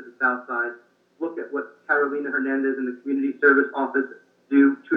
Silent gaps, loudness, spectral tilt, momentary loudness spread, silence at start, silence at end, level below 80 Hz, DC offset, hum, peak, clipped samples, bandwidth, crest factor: none; -23 LUFS; -7.5 dB/octave; 13 LU; 0 s; 0 s; under -90 dBFS; under 0.1%; none; -6 dBFS; under 0.1%; 3.7 kHz; 18 dB